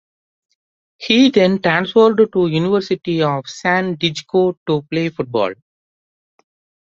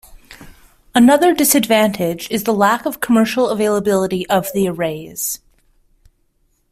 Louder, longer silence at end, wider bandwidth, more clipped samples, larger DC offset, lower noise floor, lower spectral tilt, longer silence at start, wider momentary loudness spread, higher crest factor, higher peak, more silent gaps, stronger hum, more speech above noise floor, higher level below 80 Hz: about the same, -16 LUFS vs -16 LUFS; about the same, 1.3 s vs 1.35 s; second, 7.6 kHz vs 16 kHz; neither; neither; first, under -90 dBFS vs -61 dBFS; first, -6 dB/octave vs -4 dB/octave; first, 1 s vs 0.1 s; second, 8 LU vs 11 LU; about the same, 16 dB vs 16 dB; about the same, 0 dBFS vs 0 dBFS; first, 4.57-4.66 s vs none; neither; first, over 74 dB vs 46 dB; second, -58 dBFS vs -50 dBFS